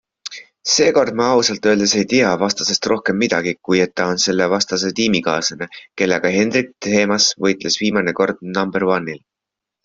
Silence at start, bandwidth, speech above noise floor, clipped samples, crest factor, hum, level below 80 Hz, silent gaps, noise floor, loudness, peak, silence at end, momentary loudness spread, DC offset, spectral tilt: 0.25 s; 7.8 kHz; 67 dB; under 0.1%; 16 dB; none; -56 dBFS; none; -84 dBFS; -17 LUFS; -2 dBFS; 0.7 s; 7 LU; under 0.1%; -3 dB/octave